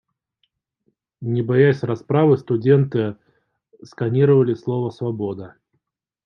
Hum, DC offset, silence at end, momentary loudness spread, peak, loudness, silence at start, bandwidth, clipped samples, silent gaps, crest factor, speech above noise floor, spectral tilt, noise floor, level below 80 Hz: none; under 0.1%; 0.75 s; 12 LU; -4 dBFS; -19 LUFS; 1.2 s; 6.4 kHz; under 0.1%; none; 18 dB; 57 dB; -9.5 dB/octave; -75 dBFS; -66 dBFS